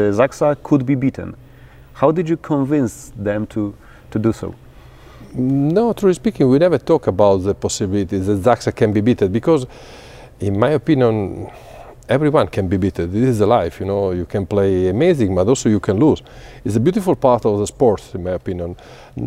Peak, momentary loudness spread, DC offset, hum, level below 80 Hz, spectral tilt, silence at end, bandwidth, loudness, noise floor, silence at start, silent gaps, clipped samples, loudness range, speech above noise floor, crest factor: 0 dBFS; 11 LU; under 0.1%; none; -44 dBFS; -7 dB/octave; 0 s; 15 kHz; -17 LUFS; -42 dBFS; 0 s; none; under 0.1%; 4 LU; 25 dB; 18 dB